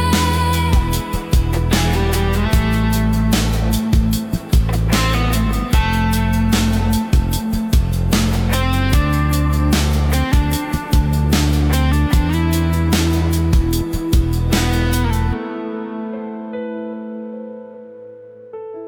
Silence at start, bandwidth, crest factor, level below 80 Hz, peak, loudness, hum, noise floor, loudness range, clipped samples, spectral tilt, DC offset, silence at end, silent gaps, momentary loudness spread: 0 s; 18 kHz; 12 dB; -20 dBFS; -4 dBFS; -17 LUFS; none; -37 dBFS; 4 LU; under 0.1%; -5.5 dB/octave; under 0.1%; 0 s; none; 11 LU